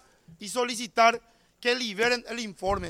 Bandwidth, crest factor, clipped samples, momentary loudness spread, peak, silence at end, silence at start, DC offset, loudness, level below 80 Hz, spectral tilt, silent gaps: 16 kHz; 20 dB; under 0.1%; 13 LU; -8 dBFS; 0 s; 0.3 s; under 0.1%; -26 LUFS; -52 dBFS; -2.5 dB/octave; none